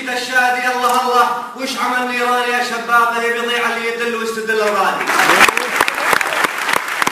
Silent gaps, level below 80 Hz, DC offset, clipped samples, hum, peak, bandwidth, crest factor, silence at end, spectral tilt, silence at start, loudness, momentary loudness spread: none; -58 dBFS; under 0.1%; under 0.1%; none; 0 dBFS; 16 kHz; 16 dB; 0 s; -1.5 dB/octave; 0 s; -15 LUFS; 7 LU